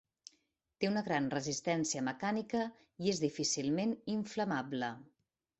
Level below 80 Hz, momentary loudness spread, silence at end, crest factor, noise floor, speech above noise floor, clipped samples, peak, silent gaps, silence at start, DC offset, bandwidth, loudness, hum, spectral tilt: -74 dBFS; 5 LU; 0.55 s; 20 dB; -78 dBFS; 42 dB; under 0.1%; -18 dBFS; none; 0.8 s; under 0.1%; 8.2 kHz; -36 LUFS; none; -4 dB/octave